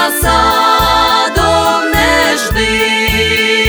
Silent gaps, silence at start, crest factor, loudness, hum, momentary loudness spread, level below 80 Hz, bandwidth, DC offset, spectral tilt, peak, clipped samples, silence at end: none; 0 s; 10 dB; -10 LUFS; none; 2 LU; -24 dBFS; over 20 kHz; under 0.1%; -3 dB/octave; 0 dBFS; under 0.1%; 0 s